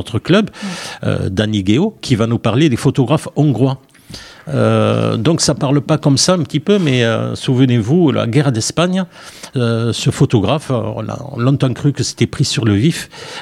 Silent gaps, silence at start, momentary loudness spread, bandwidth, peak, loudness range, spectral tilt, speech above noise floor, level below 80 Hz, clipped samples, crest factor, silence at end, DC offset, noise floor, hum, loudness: none; 0 s; 11 LU; 13.5 kHz; 0 dBFS; 3 LU; -5.5 dB/octave; 21 dB; -46 dBFS; under 0.1%; 14 dB; 0 s; under 0.1%; -35 dBFS; none; -15 LUFS